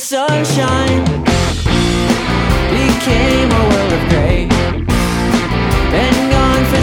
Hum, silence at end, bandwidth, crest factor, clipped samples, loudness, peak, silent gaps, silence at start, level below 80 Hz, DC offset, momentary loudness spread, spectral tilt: none; 0 s; 19.5 kHz; 12 dB; under 0.1%; -13 LUFS; 0 dBFS; none; 0 s; -20 dBFS; under 0.1%; 3 LU; -5.5 dB/octave